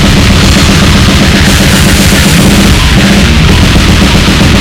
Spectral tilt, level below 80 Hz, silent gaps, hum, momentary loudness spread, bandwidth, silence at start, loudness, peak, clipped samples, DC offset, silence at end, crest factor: -4.5 dB/octave; -10 dBFS; none; none; 1 LU; over 20 kHz; 0 s; -4 LUFS; 0 dBFS; 10%; under 0.1%; 0 s; 4 dB